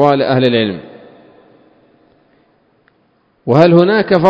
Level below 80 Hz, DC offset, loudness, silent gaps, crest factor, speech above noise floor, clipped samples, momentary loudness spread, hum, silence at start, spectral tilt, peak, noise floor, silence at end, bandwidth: -54 dBFS; under 0.1%; -11 LUFS; none; 14 dB; 47 dB; 0.3%; 15 LU; none; 0 s; -8.5 dB/octave; 0 dBFS; -57 dBFS; 0 s; 8 kHz